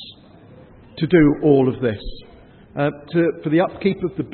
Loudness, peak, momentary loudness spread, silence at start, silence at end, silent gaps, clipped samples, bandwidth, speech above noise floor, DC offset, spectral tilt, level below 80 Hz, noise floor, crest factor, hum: -19 LUFS; -2 dBFS; 19 LU; 0 s; 0 s; none; under 0.1%; 4.4 kHz; 27 dB; under 0.1%; -12.5 dB/octave; -42 dBFS; -45 dBFS; 18 dB; none